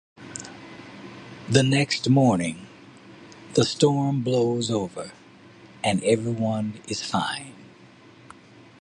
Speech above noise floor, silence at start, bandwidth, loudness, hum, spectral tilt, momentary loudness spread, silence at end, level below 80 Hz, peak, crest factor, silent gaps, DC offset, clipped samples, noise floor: 28 dB; 0.2 s; 11.5 kHz; -23 LUFS; none; -5.5 dB/octave; 22 LU; 1.15 s; -58 dBFS; -4 dBFS; 20 dB; none; under 0.1%; under 0.1%; -50 dBFS